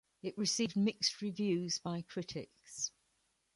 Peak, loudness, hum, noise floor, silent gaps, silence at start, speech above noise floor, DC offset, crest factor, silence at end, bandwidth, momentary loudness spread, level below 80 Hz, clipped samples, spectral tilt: -18 dBFS; -37 LUFS; none; -79 dBFS; none; 0.25 s; 42 dB; under 0.1%; 20 dB; 0.7 s; 11.5 kHz; 12 LU; -76 dBFS; under 0.1%; -3.5 dB/octave